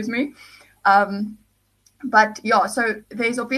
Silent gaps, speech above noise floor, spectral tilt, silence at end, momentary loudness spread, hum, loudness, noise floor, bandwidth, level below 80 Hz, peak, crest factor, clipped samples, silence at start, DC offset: none; 41 dB; -4 dB/octave; 0 s; 12 LU; 50 Hz at -50 dBFS; -20 LUFS; -62 dBFS; 13 kHz; -64 dBFS; -2 dBFS; 20 dB; under 0.1%; 0 s; under 0.1%